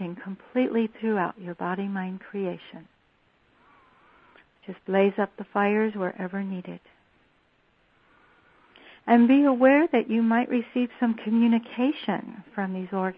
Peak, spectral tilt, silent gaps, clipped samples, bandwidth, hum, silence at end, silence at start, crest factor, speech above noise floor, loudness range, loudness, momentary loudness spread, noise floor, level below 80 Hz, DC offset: -6 dBFS; -10 dB/octave; none; under 0.1%; 4.1 kHz; none; 0.05 s; 0 s; 20 dB; 41 dB; 13 LU; -25 LUFS; 18 LU; -65 dBFS; -72 dBFS; under 0.1%